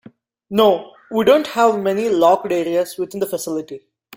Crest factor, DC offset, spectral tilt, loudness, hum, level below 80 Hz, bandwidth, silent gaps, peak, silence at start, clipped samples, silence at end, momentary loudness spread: 16 dB; under 0.1%; -4.5 dB/octave; -18 LUFS; none; -62 dBFS; 16.5 kHz; none; -2 dBFS; 0.5 s; under 0.1%; 0.4 s; 11 LU